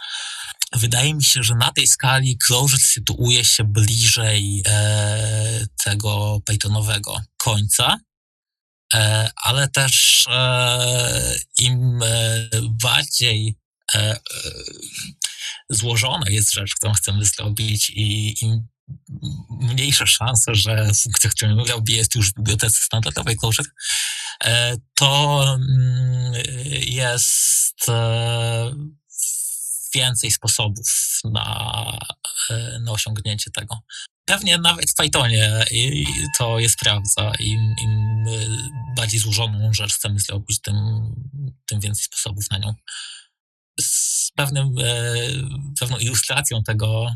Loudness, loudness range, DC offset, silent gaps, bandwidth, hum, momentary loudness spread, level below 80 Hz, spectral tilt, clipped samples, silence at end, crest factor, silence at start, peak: -18 LUFS; 6 LU; under 0.1%; 8.17-8.43 s, 8.61-8.89 s, 13.65-13.71 s, 18.79-18.87 s, 34.11-34.24 s, 43.40-43.75 s; 14.5 kHz; none; 12 LU; -44 dBFS; -2.5 dB/octave; under 0.1%; 0 s; 18 dB; 0 s; -2 dBFS